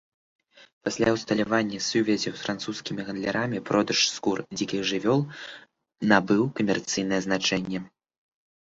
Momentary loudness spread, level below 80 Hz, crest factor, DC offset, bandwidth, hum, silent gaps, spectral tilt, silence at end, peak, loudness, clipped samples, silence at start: 10 LU; -60 dBFS; 22 dB; under 0.1%; 8 kHz; none; 0.73-0.81 s; -4 dB/octave; 0.75 s; -4 dBFS; -26 LUFS; under 0.1%; 0.6 s